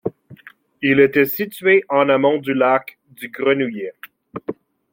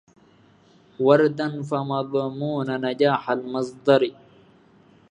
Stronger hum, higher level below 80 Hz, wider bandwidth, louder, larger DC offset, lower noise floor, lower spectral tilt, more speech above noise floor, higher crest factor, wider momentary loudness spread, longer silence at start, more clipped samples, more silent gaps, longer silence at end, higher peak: neither; first, -64 dBFS vs -72 dBFS; first, 16.5 kHz vs 10 kHz; first, -17 LUFS vs -23 LUFS; neither; second, -45 dBFS vs -55 dBFS; about the same, -6.5 dB/octave vs -7 dB/octave; second, 28 dB vs 34 dB; about the same, 18 dB vs 22 dB; first, 18 LU vs 9 LU; second, 0.05 s vs 1 s; neither; neither; second, 0.4 s vs 1 s; about the same, -2 dBFS vs -2 dBFS